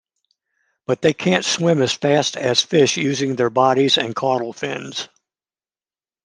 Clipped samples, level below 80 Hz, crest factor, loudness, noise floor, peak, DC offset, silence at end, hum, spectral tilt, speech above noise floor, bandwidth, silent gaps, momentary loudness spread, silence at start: under 0.1%; -64 dBFS; 20 dB; -18 LUFS; under -90 dBFS; 0 dBFS; under 0.1%; 1.2 s; none; -4 dB/octave; over 72 dB; 10.5 kHz; none; 11 LU; 0.9 s